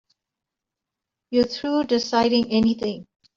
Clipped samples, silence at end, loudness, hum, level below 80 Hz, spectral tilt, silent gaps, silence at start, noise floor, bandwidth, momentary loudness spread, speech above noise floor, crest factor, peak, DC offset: under 0.1%; 0.35 s; -22 LUFS; none; -56 dBFS; -5 dB/octave; none; 1.3 s; -86 dBFS; 7.4 kHz; 8 LU; 65 dB; 18 dB; -6 dBFS; under 0.1%